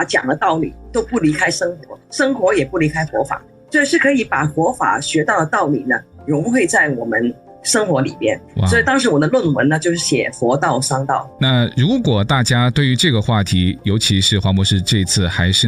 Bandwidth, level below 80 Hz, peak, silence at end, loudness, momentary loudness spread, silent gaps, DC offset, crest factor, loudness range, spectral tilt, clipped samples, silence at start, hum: 15.5 kHz; -44 dBFS; -2 dBFS; 0 s; -16 LUFS; 7 LU; none; under 0.1%; 12 dB; 2 LU; -4.5 dB/octave; under 0.1%; 0 s; none